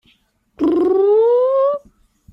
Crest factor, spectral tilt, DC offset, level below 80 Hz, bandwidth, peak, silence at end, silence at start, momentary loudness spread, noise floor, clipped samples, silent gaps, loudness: 10 dB; -8 dB/octave; under 0.1%; -56 dBFS; 5.6 kHz; -8 dBFS; 0.55 s; 0.6 s; 7 LU; -59 dBFS; under 0.1%; none; -15 LUFS